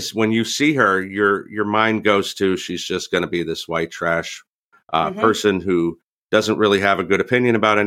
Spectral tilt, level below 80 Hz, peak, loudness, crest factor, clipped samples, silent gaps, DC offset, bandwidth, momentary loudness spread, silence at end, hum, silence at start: -4.5 dB/octave; -56 dBFS; -2 dBFS; -19 LUFS; 18 dB; under 0.1%; 4.49-4.70 s, 6.03-6.29 s; under 0.1%; 16 kHz; 8 LU; 0 s; none; 0 s